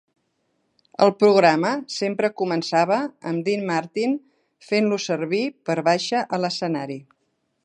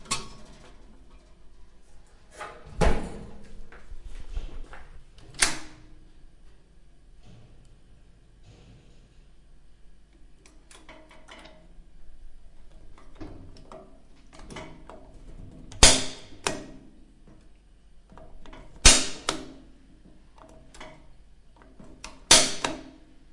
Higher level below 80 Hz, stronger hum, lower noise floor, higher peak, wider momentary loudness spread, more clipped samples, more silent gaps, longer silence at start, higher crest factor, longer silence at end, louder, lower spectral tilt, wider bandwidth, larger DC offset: second, -74 dBFS vs -38 dBFS; neither; first, -72 dBFS vs -52 dBFS; about the same, -2 dBFS vs 0 dBFS; second, 10 LU vs 32 LU; neither; neither; first, 1 s vs 0 s; second, 20 dB vs 30 dB; first, 0.65 s vs 0.45 s; about the same, -22 LUFS vs -21 LUFS; first, -5 dB/octave vs -1.5 dB/octave; second, 10 kHz vs 11.5 kHz; neither